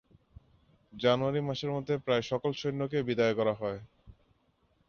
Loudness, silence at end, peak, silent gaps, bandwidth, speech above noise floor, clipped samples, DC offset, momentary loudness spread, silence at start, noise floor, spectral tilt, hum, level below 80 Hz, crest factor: -31 LUFS; 0.75 s; -14 dBFS; none; 7 kHz; 41 dB; under 0.1%; under 0.1%; 6 LU; 0.95 s; -71 dBFS; -6.5 dB/octave; none; -62 dBFS; 18 dB